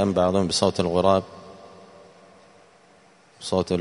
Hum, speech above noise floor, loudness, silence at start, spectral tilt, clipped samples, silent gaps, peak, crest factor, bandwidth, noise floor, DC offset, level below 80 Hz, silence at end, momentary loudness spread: none; 33 dB; -22 LUFS; 0 s; -5.5 dB/octave; under 0.1%; none; -2 dBFS; 22 dB; 11 kHz; -55 dBFS; under 0.1%; -56 dBFS; 0 s; 21 LU